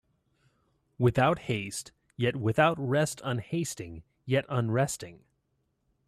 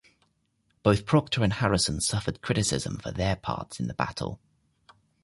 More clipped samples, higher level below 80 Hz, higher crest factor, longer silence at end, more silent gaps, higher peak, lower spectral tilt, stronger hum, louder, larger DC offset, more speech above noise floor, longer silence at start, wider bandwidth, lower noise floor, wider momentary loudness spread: neither; second, -60 dBFS vs -46 dBFS; about the same, 20 dB vs 20 dB; about the same, 0.9 s vs 0.85 s; neither; second, -12 dBFS vs -8 dBFS; about the same, -5.5 dB/octave vs -4.5 dB/octave; neither; about the same, -29 LUFS vs -27 LUFS; neither; about the same, 48 dB vs 45 dB; first, 1 s vs 0.85 s; first, 14 kHz vs 11.5 kHz; first, -76 dBFS vs -72 dBFS; first, 15 LU vs 10 LU